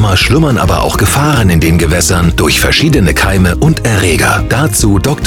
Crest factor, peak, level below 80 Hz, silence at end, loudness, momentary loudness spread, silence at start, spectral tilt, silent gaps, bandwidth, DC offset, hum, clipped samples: 8 dB; 0 dBFS; -18 dBFS; 0 s; -9 LUFS; 2 LU; 0 s; -4.5 dB/octave; none; 18.5 kHz; under 0.1%; none; under 0.1%